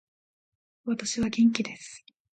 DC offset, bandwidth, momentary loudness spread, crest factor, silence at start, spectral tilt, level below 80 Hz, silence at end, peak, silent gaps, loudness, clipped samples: under 0.1%; 9.2 kHz; 18 LU; 22 dB; 0.85 s; -4 dB/octave; -62 dBFS; 0.35 s; -8 dBFS; none; -27 LUFS; under 0.1%